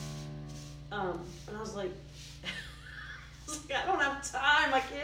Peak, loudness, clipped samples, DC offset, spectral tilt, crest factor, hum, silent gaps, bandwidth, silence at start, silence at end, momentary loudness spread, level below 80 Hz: -14 dBFS; -33 LUFS; under 0.1%; under 0.1%; -3 dB/octave; 20 dB; 60 Hz at -60 dBFS; none; 17 kHz; 0 s; 0 s; 19 LU; -54 dBFS